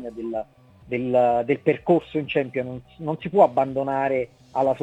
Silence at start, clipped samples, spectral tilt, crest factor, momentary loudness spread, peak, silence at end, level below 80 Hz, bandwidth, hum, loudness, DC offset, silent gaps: 0 s; under 0.1%; -8 dB/octave; 20 dB; 12 LU; -4 dBFS; 0 s; -58 dBFS; 9 kHz; none; -23 LUFS; under 0.1%; none